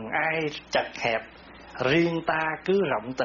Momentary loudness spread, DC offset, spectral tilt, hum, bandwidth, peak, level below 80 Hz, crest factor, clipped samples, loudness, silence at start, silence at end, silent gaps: 7 LU; under 0.1%; -3.5 dB/octave; none; 7.2 kHz; -10 dBFS; -58 dBFS; 16 dB; under 0.1%; -26 LUFS; 0 s; 0 s; none